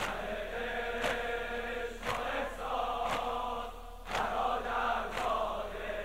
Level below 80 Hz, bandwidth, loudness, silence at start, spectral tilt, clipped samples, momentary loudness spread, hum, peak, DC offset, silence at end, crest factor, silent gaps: -48 dBFS; 16 kHz; -35 LUFS; 0 s; -3.5 dB/octave; under 0.1%; 6 LU; none; -18 dBFS; 0.2%; 0 s; 18 dB; none